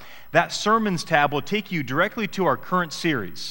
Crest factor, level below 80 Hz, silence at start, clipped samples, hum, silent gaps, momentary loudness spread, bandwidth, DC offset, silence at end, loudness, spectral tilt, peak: 22 dB; -56 dBFS; 0 s; under 0.1%; none; none; 5 LU; 16.5 kHz; 0.8%; 0 s; -23 LUFS; -4.5 dB/octave; -2 dBFS